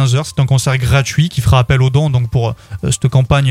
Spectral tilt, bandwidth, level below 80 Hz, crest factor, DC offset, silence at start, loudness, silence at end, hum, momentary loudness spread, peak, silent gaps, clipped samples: -5.5 dB/octave; 14.5 kHz; -30 dBFS; 12 dB; under 0.1%; 0 s; -13 LUFS; 0 s; none; 6 LU; 0 dBFS; none; under 0.1%